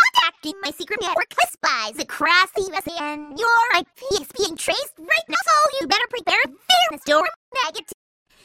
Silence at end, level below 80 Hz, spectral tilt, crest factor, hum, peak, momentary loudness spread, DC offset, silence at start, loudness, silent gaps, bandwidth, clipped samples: 0.5 s; -58 dBFS; -0.5 dB/octave; 18 dB; none; -2 dBFS; 10 LU; under 0.1%; 0 s; -20 LUFS; 7.36-7.52 s; 16.5 kHz; under 0.1%